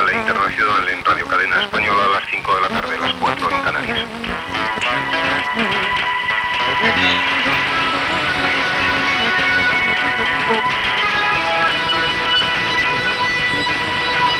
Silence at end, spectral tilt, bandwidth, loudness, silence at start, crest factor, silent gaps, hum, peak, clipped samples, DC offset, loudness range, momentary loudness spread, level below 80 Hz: 0 s; -3.5 dB/octave; 18 kHz; -16 LUFS; 0 s; 14 dB; none; none; -2 dBFS; under 0.1%; under 0.1%; 3 LU; 4 LU; -46 dBFS